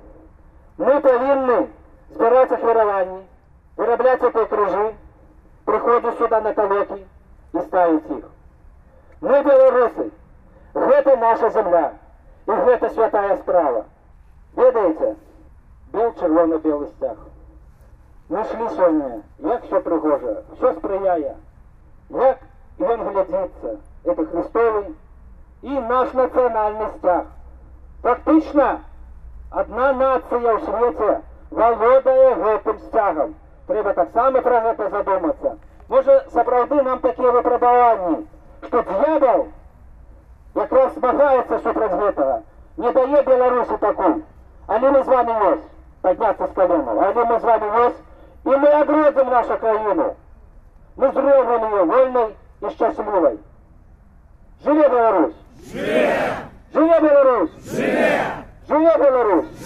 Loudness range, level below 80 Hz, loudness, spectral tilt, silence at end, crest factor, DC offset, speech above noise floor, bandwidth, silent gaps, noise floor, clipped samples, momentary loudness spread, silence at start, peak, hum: 5 LU; -46 dBFS; -18 LUFS; -7 dB/octave; 0 s; 14 dB; under 0.1%; 32 dB; 7.2 kHz; none; -49 dBFS; under 0.1%; 13 LU; 0.05 s; -4 dBFS; none